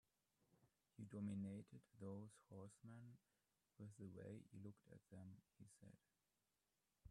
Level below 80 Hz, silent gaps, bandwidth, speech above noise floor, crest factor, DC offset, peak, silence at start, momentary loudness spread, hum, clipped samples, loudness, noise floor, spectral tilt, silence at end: -88 dBFS; none; 11.5 kHz; over 32 dB; 18 dB; under 0.1%; -42 dBFS; 0.5 s; 15 LU; none; under 0.1%; -59 LUFS; under -90 dBFS; -8 dB/octave; 0 s